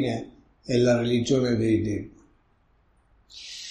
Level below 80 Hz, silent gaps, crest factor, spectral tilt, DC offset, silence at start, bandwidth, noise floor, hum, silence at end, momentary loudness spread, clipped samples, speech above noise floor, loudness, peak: -52 dBFS; none; 16 dB; -6 dB/octave; under 0.1%; 0 s; 10.5 kHz; -64 dBFS; none; 0 s; 22 LU; under 0.1%; 39 dB; -24 LUFS; -12 dBFS